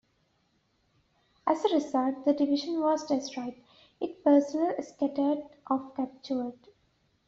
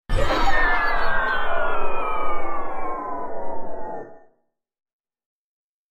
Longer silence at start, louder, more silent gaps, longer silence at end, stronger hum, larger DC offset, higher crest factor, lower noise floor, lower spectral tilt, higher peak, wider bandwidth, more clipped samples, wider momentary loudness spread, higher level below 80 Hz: first, 1.45 s vs 0.1 s; second, -29 LUFS vs -25 LUFS; neither; second, 0.75 s vs 1.75 s; neither; neither; about the same, 18 dB vs 14 dB; first, -72 dBFS vs -68 dBFS; about the same, -4.5 dB/octave vs -5 dB/octave; second, -12 dBFS vs -6 dBFS; about the same, 7.6 kHz vs 7.2 kHz; neither; about the same, 13 LU vs 13 LU; second, -74 dBFS vs -30 dBFS